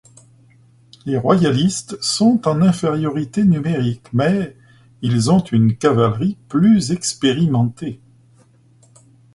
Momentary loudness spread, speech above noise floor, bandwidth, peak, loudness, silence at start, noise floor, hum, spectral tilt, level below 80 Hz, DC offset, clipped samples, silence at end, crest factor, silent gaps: 8 LU; 35 dB; 11.5 kHz; 0 dBFS; -17 LUFS; 1.05 s; -52 dBFS; none; -6 dB/octave; -50 dBFS; under 0.1%; under 0.1%; 1.4 s; 16 dB; none